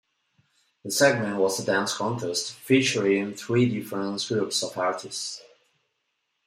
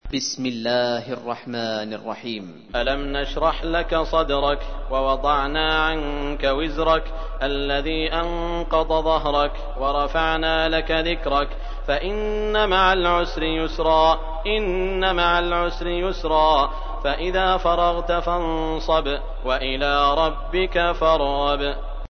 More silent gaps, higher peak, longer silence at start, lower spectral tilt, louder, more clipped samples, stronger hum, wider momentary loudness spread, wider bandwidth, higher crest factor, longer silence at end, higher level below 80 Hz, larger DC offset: neither; about the same, -6 dBFS vs -4 dBFS; first, 0.85 s vs 0.05 s; about the same, -4 dB/octave vs -4.5 dB/octave; second, -25 LUFS vs -22 LUFS; neither; neither; about the same, 10 LU vs 9 LU; first, 16 kHz vs 6.6 kHz; about the same, 20 dB vs 18 dB; first, 1.05 s vs 0.05 s; second, -70 dBFS vs -28 dBFS; neither